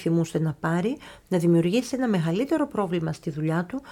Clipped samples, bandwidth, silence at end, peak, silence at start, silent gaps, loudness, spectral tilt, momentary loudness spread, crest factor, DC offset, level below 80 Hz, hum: under 0.1%; 14 kHz; 0 s; -12 dBFS; 0 s; none; -25 LUFS; -7 dB/octave; 7 LU; 14 dB; under 0.1%; -58 dBFS; none